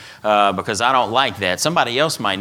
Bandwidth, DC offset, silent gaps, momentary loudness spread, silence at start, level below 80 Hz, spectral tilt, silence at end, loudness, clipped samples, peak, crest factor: 17.5 kHz; under 0.1%; none; 3 LU; 0 s; -58 dBFS; -3 dB/octave; 0 s; -17 LUFS; under 0.1%; 0 dBFS; 18 dB